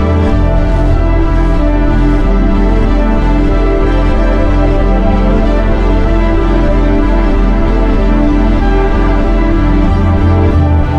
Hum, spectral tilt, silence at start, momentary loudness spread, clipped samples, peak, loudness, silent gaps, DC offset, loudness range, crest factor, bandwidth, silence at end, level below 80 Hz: none; -8.5 dB/octave; 0 s; 2 LU; under 0.1%; 0 dBFS; -12 LUFS; none; under 0.1%; 1 LU; 8 dB; 5.8 kHz; 0 s; -10 dBFS